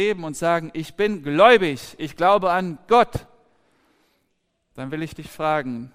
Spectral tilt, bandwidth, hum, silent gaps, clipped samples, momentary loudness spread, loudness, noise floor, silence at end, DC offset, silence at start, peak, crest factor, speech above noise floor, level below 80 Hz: -5 dB/octave; 16 kHz; none; none; under 0.1%; 18 LU; -20 LUFS; -71 dBFS; 0.05 s; under 0.1%; 0 s; -2 dBFS; 20 dB; 51 dB; -52 dBFS